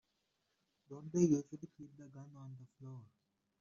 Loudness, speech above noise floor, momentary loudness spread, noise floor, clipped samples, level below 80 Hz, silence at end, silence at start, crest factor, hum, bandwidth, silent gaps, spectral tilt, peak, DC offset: -35 LUFS; 43 dB; 23 LU; -83 dBFS; under 0.1%; -78 dBFS; 0.55 s; 0.9 s; 22 dB; none; 7.4 kHz; none; -10.5 dB/octave; -20 dBFS; under 0.1%